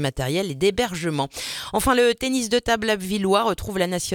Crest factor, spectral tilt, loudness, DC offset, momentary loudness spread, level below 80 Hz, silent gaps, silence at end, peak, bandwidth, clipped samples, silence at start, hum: 18 dB; -4 dB/octave; -22 LUFS; under 0.1%; 7 LU; -42 dBFS; none; 0 s; -4 dBFS; 19 kHz; under 0.1%; 0 s; none